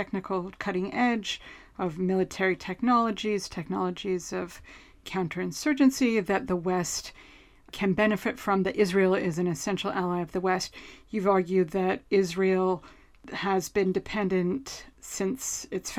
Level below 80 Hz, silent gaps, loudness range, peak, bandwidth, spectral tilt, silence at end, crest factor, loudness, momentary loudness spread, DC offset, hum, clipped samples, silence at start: -56 dBFS; none; 2 LU; -10 dBFS; 15.5 kHz; -5 dB/octave; 0 s; 18 dB; -28 LUFS; 11 LU; under 0.1%; none; under 0.1%; 0 s